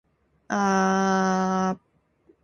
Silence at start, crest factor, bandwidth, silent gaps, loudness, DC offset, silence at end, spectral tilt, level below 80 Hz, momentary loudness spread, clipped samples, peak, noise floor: 0.5 s; 16 dB; 7.2 kHz; none; -23 LUFS; under 0.1%; 0.65 s; -5.5 dB/octave; -60 dBFS; 8 LU; under 0.1%; -8 dBFS; -67 dBFS